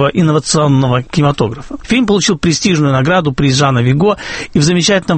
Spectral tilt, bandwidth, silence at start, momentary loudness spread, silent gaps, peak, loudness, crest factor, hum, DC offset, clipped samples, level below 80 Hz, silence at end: -5 dB/octave; 8.8 kHz; 0 s; 5 LU; none; 0 dBFS; -12 LUFS; 12 dB; none; under 0.1%; under 0.1%; -36 dBFS; 0 s